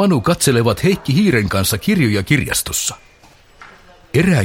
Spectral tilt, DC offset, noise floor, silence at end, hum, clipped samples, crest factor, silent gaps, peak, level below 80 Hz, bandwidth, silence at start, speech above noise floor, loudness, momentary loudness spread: -5 dB/octave; 0.1%; -47 dBFS; 0 s; none; under 0.1%; 16 dB; none; 0 dBFS; -40 dBFS; 16.5 kHz; 0 s; 32 dB; -16 LUFS; 5 LU